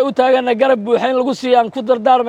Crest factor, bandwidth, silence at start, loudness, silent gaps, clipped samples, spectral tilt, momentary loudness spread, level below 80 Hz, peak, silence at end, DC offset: 12 dB; 10 kHz; 0 s; -14 LUFS; none; under 0.1%; -5 dB/octave; 3 LU; -66 dBFS; -2 dBFS; 0 s; under 0.1%